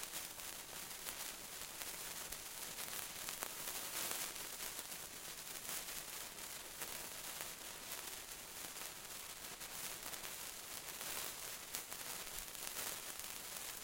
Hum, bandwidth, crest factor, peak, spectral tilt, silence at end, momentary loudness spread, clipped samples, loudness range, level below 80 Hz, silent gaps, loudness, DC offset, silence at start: none; 17 kHz; 34 dB; -16 dBFS; 0 dB/octave; 0 s; 5 LU; under 0.1%; 3 LU; -70 dBFS; none; -45 LUFS; under 0.1%; 0 s